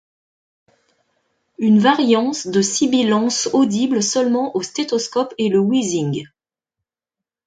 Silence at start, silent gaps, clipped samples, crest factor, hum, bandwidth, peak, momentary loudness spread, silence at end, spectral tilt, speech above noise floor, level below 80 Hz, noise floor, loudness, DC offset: 1.6 s; none; under 0.1%; 16 dB; none; 9.4 kHz; -2 dBFS; 8 LU; 1.2 s; -4.5 dB/octave; 70 dB; -64 dBFS; -87 dBFS; -17 LUFS; under 0.1%